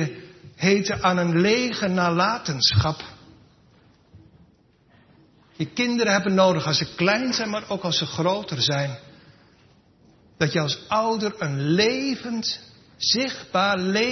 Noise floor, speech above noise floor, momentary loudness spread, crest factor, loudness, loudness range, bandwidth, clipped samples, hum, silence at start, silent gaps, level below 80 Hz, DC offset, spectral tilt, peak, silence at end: -58 dBFS; 36 dB; 8 LU; 20 dB; -22 LUFS; 5 LU; 6.4 kHz; under 0.1%; none; 0 s; none; -56 dBFS; under 0.1%; -4.5 dB/octave; -4 dBFS; 0 s